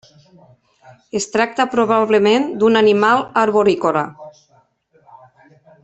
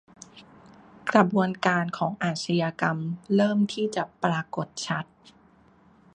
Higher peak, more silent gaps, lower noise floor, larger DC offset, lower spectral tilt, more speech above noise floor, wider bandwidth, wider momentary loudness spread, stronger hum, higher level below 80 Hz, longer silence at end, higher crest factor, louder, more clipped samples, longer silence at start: about the same, -2 dBFS vs -4 dBFS; neither; about the same, -57 dBFS vs -58 dBFS; neither; second, -4.5 dB/octave vs -6 dB/octave; first, 42 dB vs 32 dB; second, 8.2 kHz vs 9.6 kHz; about the same, 9 LU vs 10 LU; neither; first, -60 dBFS vs -66 dBFS; first, 1.55 s vs 1.1 s; second, 16 dB vs 24 dB; first, -15 LUFS vs -26 LUFS; neither; first, 1.15 s vs 0.35 s